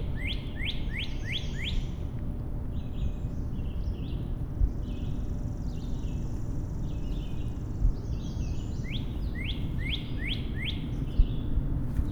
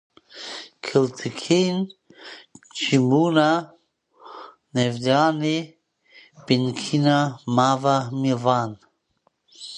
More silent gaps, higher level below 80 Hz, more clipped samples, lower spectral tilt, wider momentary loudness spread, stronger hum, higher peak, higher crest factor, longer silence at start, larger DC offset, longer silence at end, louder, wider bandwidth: neither; first, -32 dBFS vs -68 dBFS; neither; about the same, -6.5 dB/octave vs -5.5 dB/octave; second, 4 LU vs 22 LU; neither; second, -10 dBFS vs -4 dBFS; about the same, 22 dB vs 20 dB; second, 0 s vs 0.35 s; neither; about the same, 0 s vs 0 s; second, -34 LUFS vs -22 LUFS; about the same, 10 kHz vs 10.5 kHz